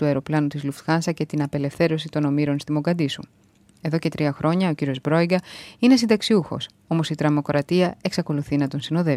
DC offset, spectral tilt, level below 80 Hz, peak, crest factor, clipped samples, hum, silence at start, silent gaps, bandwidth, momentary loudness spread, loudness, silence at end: under 0.1%; -6.5 dB/octave; -58 dBFS; -6 dBFS; 16 dB; under 0.1%; none; 0 s; none; 14 kHz; 7 LU; -22 LUFS; 0 s